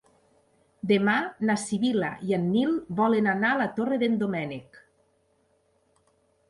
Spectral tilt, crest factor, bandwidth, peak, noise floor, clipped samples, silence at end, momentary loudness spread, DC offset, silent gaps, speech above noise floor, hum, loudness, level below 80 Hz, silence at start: -6 dB/octave; 18 dB; 11.5 kHz; -10 dBFS; -68 dBFS; under 0.1%; 1.7 s; 7 LU; under 0.1%; none; 43 dB; none; -26 LUFS; -66 dBFS; 0.85 s